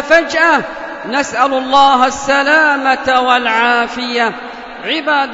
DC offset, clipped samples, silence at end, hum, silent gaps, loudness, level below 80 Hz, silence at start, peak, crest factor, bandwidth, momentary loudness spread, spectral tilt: under 0.1%; under 0.1%; 0 s; none; none; -12 LUFS; -48 dBFS; 0 s; 0 dBFS; 12 dB; 8 kHz; 10 LU; -2 dB/octave